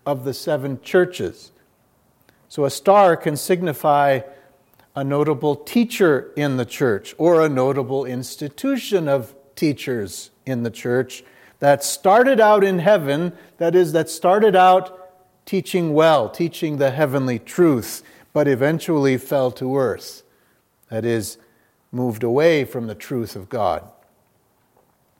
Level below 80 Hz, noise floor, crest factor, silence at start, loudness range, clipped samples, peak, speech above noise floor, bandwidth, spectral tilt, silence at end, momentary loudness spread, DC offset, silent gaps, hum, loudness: -66 dBFS; -62 dBFS; 18 dB; 0.05 s; 6 LU; under 0.1%; 0 dBFS; 44 dB; 16.5 kHz; -5.5 dB/octave; 1.4 s; 14 LU; under 0.1%; none; none; -19 LUFS